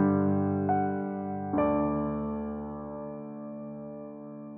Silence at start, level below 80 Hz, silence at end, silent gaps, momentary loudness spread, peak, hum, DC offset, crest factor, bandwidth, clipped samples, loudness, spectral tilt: 0 s; -54 dBFS; 0 s; none; 14 LU; -12 dBFS; none; under 0.1%; 18 dB; 3.1 kHz; under 0.1%; -31 LUFS; -13 dB/octave